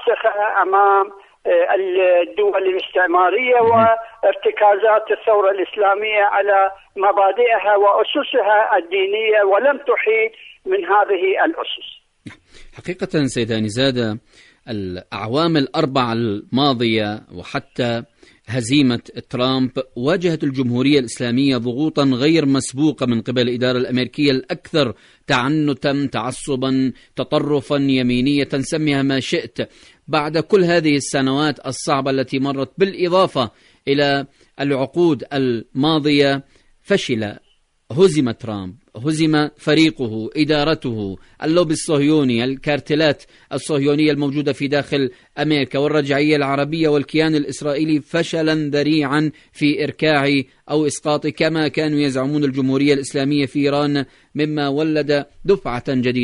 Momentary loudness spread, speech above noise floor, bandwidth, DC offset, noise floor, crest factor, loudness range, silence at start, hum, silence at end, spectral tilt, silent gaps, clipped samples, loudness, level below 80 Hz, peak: 10 LU; 24 dB; 11 kHz; under 0.1%; -41 dBFS; 16 dB; 4 LU; 0 s; none; 0 s; -5.5 dB/octave; none; under 0.1%; -18 LUFS; -50 dBFS; -2 dBFS